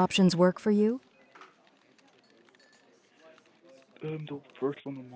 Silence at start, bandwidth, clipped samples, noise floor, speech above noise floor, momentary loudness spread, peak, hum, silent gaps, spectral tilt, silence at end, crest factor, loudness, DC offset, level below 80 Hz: 0 s; 8 kHz; under 0.1%; -63 dBFS; 36 dB; 18 LU; -10 dBFS; none; none; -6 dB/octave; 0 s; 20 dB; -28 LUFS; under 0.1%; -72 dBFS